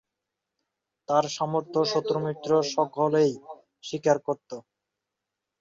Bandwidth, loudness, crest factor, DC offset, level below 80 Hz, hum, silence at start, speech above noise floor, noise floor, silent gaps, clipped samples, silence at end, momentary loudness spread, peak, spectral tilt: 7.8 kHz; -26 LUFS; 20 dB; under 0.1%; -72 dBFS; none; 1.1 s; 60 dB; -86 dBFS; none; under 0.1%; 1 s; 15 LU; -8 dBFS; -5 dB/octave